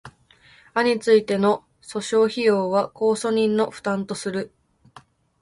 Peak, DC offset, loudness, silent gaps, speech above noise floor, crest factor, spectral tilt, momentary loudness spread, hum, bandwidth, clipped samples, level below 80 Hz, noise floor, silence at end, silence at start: -4 dBFS; under 0.1%; -22 LUFS; none; 33 dB; 18 dB; -5 dB/octave; 10 LU; none; 11.5 kHz; under 0.1%; -64 dBFS; -54 dBFS; 0.95 s; 0.05 s